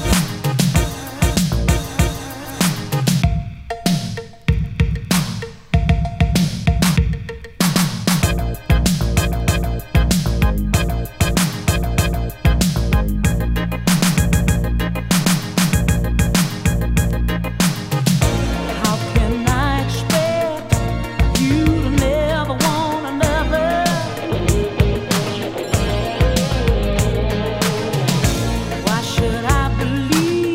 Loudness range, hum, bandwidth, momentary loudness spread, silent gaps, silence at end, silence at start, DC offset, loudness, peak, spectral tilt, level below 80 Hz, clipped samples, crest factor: 2 LU; none; 16.5 kHz; 5 LU; none; 0 s; 0 s; under 0.1%; -18 LUFS; 0 dBFS; -5 dB/octave; -24 dBFS; under 0.1%; 16 dB